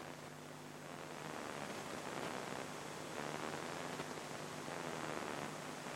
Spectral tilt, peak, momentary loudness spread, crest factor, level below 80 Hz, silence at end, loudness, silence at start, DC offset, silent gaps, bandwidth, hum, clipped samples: -3.5 dB/octave; -26 dBFS; 7 LU; 20 dB; -78 dBFS; 0 s; -46 LUFS; 0 s; under 0.1%; none; 16 kHz; 50 Hz at -60 dBFS; under 0.1%